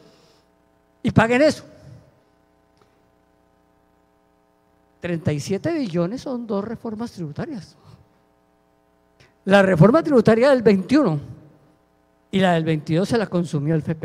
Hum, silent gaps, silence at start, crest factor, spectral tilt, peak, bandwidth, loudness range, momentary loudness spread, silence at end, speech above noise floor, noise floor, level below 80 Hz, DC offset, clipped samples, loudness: 60 Hz at -55 dBFS; none; 1.05 s; 20 dB; -7 dB/octave; -2 dBFS; 13 kHz; 13 LU; 16 LU; 0.05 s; 42 dB; -61 dBFS; -54 dBFS; under 0.1%; under 0.1%; -19 LUFS